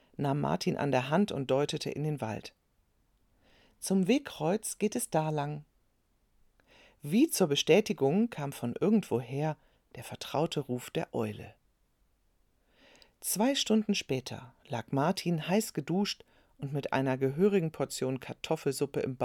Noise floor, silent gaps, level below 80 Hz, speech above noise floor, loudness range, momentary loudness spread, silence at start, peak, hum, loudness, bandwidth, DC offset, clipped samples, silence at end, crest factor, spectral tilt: -72 dBFS; none; -68 dBFS; 41 dB; 6 LU; 13 LU; 0.2 s; -10 dBFS; none; -31 LUFS; 19 kHz; under 0.1%; under 0.1%; 0 s; 22 dB; -5 dB/octave